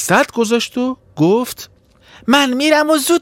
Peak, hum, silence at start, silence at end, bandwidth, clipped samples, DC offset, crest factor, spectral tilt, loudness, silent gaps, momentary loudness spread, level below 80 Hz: 0 dBFS; none; 0 s; 0 s; 16.5 kHz; under 0.1%; under 0.1%; 14 dB; -4 dB/octave; -15 LUFS; none; 11 LU; -56 dBFS